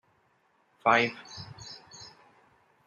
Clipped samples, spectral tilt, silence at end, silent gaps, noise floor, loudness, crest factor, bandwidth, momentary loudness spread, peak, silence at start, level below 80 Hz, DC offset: under 0.1%; -4 dB/octave; 0.8 s; none; -69 dBFS; -26 LUFS; 26 dB; 11 kHz; 24 LU; -8 dBFS; 0.85 s; -70 dBFS; under 0.1%